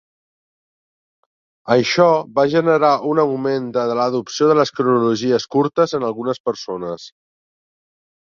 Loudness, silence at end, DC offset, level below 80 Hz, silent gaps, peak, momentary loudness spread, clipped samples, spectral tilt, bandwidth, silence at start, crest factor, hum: -17 LUFS; 1.25 s; under 0.1%; -64 dBFS; 6.40-6.44 s; -2 dBFS; 10 LU; under 0.1%; -5.5 dB/octave; 7.4 kHz; 1.65 s; 16 dB; none